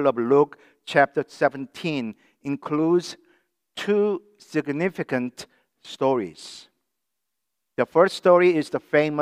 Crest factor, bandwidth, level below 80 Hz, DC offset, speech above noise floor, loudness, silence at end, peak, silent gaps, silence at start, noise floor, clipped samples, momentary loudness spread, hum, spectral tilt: 20 dB; 13 kHz; -74 dBFS; under 0.1%; 60 dB; -23 LUFS; 0 s; -2 dBFS; none; 0 s; -83 dBFS; under 0.1%; 19 LU; none; -6 dB/octave